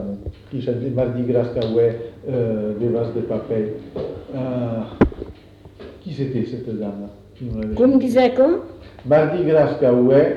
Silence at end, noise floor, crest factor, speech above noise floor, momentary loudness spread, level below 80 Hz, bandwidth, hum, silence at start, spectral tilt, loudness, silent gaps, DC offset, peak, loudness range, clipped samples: 0 s; -43 dBFS; 18 dB; 24 dB; 17 LU; -40 dBFS; 12 kHz; none; 0 s; -9 dB/octave; -20 LUFS; none; under 0.1%; -2 dBFS; 7 LU; under 0.1%